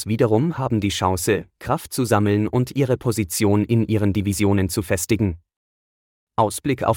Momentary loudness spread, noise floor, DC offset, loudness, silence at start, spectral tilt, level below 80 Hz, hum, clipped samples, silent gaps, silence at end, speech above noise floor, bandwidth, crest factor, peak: 6 LU; under -90 dBFS; under 0.1%; -21 LUFS; 0 s; -6 dB/octave; -48 dBFS; none; under 0.1%; 5.56-6.27 s; 0 s; over 70 dB; 18 kHz; 16 dB; -4 dBFS